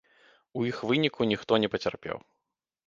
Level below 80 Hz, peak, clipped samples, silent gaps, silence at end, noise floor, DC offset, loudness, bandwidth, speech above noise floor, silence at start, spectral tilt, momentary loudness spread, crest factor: -64 dBFS; -8 dBFS; under 0.1%; none; 0.65 s; -86 dBFS; under 0.1%; -28 LUFS; 7.6 kHz; 58 dB; 0.55 s; -6 dB/octave; 13 LU; 22 dB